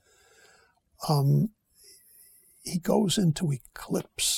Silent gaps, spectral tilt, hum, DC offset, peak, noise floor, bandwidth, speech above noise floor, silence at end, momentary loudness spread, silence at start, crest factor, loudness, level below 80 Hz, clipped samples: none; -5 dB/octave; none; under 0.1%; -10 dBFS; -63 dBFS; 17 kHz; 37 dB; 0 s; 12 LU; 1 s; 20 dB; -27 LUFS; -58 dBFS; under 0.1%